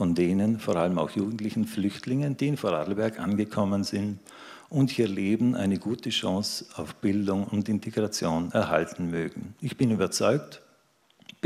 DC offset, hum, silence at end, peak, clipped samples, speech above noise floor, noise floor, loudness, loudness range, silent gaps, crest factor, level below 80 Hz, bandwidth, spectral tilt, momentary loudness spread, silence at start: under 0.1%; none; 0.85 s; -6 dBFS; under 0.1%; 37 dB; -64 dBFS; -27 LUFS; 1 LU; none; 20 dB; -62 dBFS; 15 kHz; -6 dB/octave; 8 LU; 0 s